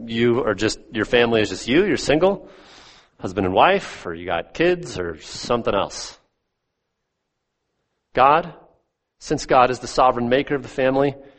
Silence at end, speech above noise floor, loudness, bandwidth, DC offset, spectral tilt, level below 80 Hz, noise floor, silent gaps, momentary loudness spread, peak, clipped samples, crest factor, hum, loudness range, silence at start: 0.15 s; 57 dB; -20 LUFS; 8.8 kHz; under 0.1%; -5 dB/octave; -46 dBFS; -77 dBFS; none; 14 LU; -2 dBFS; under 0.1%; 20 dB; none; 6 LU; 0 s